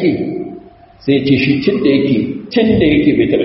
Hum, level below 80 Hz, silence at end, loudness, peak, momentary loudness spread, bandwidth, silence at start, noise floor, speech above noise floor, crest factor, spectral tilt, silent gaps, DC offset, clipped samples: none; -40 dBFS; 0 s; -13 LUFS; 0 dBFS; 11 LU; 5.8 kHz; 0 s; -37 dBFS; 25 dB; 14 dB; -6 dB/octave; none; under 0.1%; under 0.1%